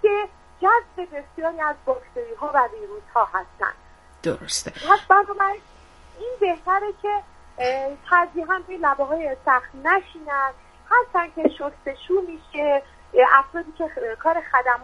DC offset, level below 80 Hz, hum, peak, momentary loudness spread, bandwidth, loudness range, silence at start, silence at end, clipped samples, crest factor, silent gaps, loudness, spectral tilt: under 0.1%; -52 dBFS; none; 0 dBFS; 13 LU; 11.5 kHz; 3 LU; 0.05 s; 0 s; under 0.1%; 22 dB; none; -22 LUFS; -3 dB/octave